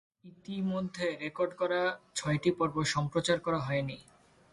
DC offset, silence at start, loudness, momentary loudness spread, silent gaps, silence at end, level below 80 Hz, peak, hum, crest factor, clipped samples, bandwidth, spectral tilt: under 0.1%; 0.25 s; -32 LUFS; 7 LU; none; 0.5 s; -62 dBFS; -16 dBFS; none; 18 dB; under 0.1%; 11.5 kHz; -5 dB/octave